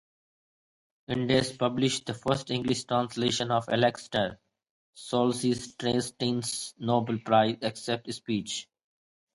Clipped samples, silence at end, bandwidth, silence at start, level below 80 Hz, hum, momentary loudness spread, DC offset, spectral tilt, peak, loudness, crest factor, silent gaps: under 0.1%; 0.7 s; 11.5 kHz; 1.1 s; -62 dBFS; none; 8 LU; under 0.1%; -4.5 dB/octave; -10 dBFS; -29 LUFS; 20 dB; 4.71-4.93 s